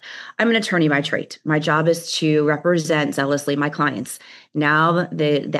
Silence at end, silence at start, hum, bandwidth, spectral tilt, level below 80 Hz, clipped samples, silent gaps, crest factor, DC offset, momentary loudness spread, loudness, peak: 0 s; 0.05 s; none; 12.5 kHz; -5 dB/octave; -78 dBFS; under 0.1%; none; 16 dB; under 0.1%; 8 LU; -19 LUFS; -4 dBFS